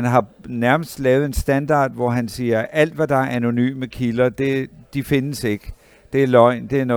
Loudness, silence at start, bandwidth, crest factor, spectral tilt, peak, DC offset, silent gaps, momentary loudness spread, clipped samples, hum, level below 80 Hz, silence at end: -19 LUFS; 0 s; over 20 kHz; 18 dB; -6.5 dB/octave; 0 dBFS; under 0.1%; none; 9 LU; under 0.1%; none; -38 dBFS; 0 s